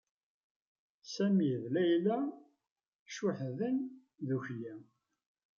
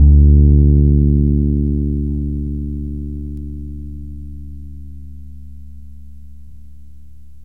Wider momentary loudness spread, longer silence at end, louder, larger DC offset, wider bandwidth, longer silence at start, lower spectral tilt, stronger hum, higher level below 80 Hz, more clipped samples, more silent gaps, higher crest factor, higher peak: second, 16 LU vs 26 LU; second, 0.75 s vs 1.25 s; second, -35 LUFS vs -15 LUFS; second, under 0.1% vs 2%; first, 7.4 kHz vs 0.8 kHz; first, 1.05 s vs 0 s; second, -7 dB/octave vs -14 dB/octave; neither; second, -84 dBFS vs -18 dBFS; neither; first, 2.71-2.76 s, 2.88-3.06 s vs none; about the same, 16 dB vs 16 dB; second, -20 dBFS vs 0 dBFS